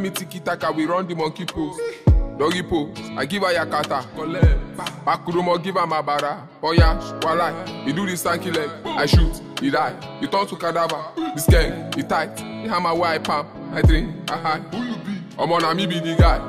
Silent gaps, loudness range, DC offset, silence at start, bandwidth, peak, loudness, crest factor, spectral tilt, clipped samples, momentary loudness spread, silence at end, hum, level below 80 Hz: none; 1 LU; under 0.1%; 0 s; 15.5 kHz; -2 dBFS; -22 LUFS; 18 dB; -5.5 dB/octave; under 0.1%; 10 LU; 0 s; none; -26 dBFS